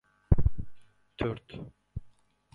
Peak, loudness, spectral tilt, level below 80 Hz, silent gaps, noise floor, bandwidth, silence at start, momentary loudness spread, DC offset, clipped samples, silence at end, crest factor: -8 dBFS; -31 LUFS; -9.5 dB/octave; -36 dBFS; none; -58 dBFS; 4.7 kHz; 0.3 s; 19 LU; under 0.1%; under 0.1%; 0.45 s; 22 dB